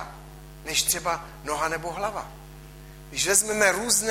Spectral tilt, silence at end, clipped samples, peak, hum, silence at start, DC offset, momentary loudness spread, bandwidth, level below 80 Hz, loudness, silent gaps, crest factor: -1 dB/octave; 0 s; under 0.1%; -4 dBFS; none; 0 s; under 0.1%; 25 LU; 16 kHz; -48 dBFS; -24 LUFS; none; 22 dB